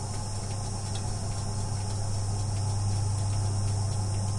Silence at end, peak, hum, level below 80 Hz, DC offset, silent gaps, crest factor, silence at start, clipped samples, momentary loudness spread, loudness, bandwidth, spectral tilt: 0 s; -18 dBFS; none; -40 dBFS; under 0.1%; none; 12 dB; 0 s; under 0.1%; 4 LU; -31 LUFS; 11.5 kHz; -5 dB/octave